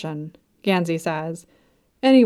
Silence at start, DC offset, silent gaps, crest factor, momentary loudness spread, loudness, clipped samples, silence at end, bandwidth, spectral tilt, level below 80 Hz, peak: 0 s; under 0.1%; none; 16 dB; 16 LU; -23 LUFS; under 0.1%; 0 s; 13 kHz; -6.5 dB/octave; -68 dBFS; -4 dBFS